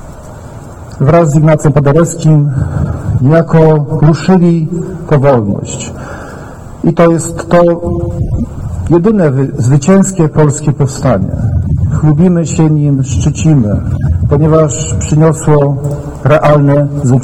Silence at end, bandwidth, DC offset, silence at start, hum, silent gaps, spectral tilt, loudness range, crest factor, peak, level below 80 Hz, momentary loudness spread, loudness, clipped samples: 0 s; 11.5 kHz; under 0.1%; 0 s; none; none; -7.5 dB/octave; 3 LU; 10 dB; 0 dBFS; -26 dBFS; 12 LU; -10 LUFS; 0.6%